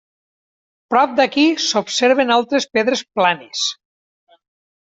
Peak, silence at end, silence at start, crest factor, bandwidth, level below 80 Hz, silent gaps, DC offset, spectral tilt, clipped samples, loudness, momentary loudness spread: -2 dBFS; 1.1 s; 0.9 s; 16 dB; 8 kHz; -66 dBFS; none; under 0.1%; -2.5 dB/octave; under 0.1%; -17 LUFS; 7 LU